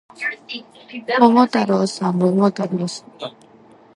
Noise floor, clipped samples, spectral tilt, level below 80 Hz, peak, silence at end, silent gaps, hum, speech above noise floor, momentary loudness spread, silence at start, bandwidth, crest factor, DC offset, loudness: -48 dBFS; under 0.1%; -6 dB/octave; -68 dBFS; 0 dBFS; 0.65 s; none; none; 29 dB; 20 LU; 0.2 s; 11.5 kHz; 20 dB; under 0.1%; -18 LUFS